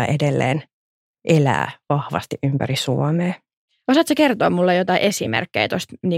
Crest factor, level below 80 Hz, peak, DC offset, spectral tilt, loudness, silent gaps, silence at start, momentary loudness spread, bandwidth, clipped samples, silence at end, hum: 16 dB; -58 dBFS; -4 dBFS; under 0.1%; -5.5 dB/octave; -19 LUFS; 0.73-1.14 s, 3.57-3.68 s; 0 s; 8 LU; 16 kHz; under 0.1%; 0 s; none